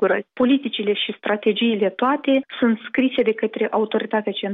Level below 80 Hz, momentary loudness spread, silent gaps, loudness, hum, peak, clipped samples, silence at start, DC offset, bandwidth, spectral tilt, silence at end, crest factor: -66 dBFS; 4 LU; none; -21 LUFS; none; -8 dBFS; under 0.1%; 0 s; under 0.1%; 4 kHz; -8 dB/octave; 0 s; 12 dB